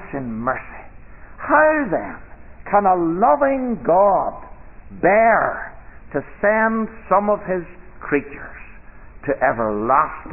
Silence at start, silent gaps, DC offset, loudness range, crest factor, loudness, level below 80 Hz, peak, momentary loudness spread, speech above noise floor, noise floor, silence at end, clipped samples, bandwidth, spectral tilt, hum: 0 s; none; 0.5%; 4 LU; 18 dB; -18 LUFS; -42 dBFS; -2 dBFS; 20 LU; 21 dB; -40 dBFS; 0 s; under 0.1%; 3 kHz; -12 dB/octave; none